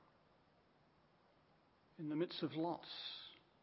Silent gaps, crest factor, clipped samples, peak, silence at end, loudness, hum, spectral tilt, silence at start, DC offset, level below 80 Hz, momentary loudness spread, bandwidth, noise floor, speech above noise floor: none; 20 dB; under 0.1%; -28 dBFS; 0.25 s; -45 LUFS; none; -4 dB/octave; 2 s; under 0.1%; -88 dBFS; 10 LU; 5.6 kHz; -73 dBFS; 30 dB